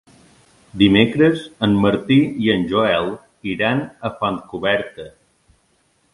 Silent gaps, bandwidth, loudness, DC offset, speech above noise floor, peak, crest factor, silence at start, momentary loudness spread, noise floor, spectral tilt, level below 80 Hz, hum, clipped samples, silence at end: none; 11.5 kHz; -18 LUFS; under 0.1%; 44 dB; 0 dBFS; 18 dB; 0.75 s; 14 LU; -62 dBFS; -7 dB/octave; -48 dBFS; none; under 0.1%; 1.05 s